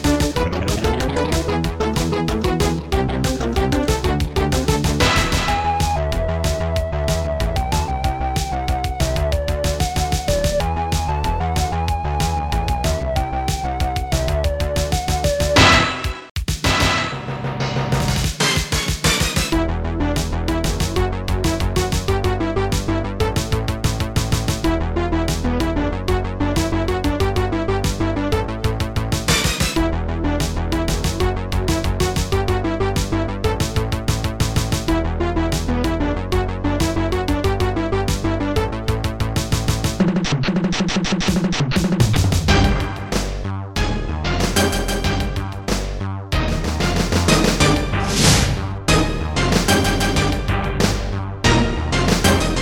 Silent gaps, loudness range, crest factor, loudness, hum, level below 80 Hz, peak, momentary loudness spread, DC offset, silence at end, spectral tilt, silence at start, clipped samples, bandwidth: 16.31-16.35 s; 4 LU; 16 dB; -20 LUFS; none; -26 dBFS; -2 dBFS; 6 LU; under 0.1%; 0 s; -4.5 dB/octave; 0 s; under 0.1%; 17 kHz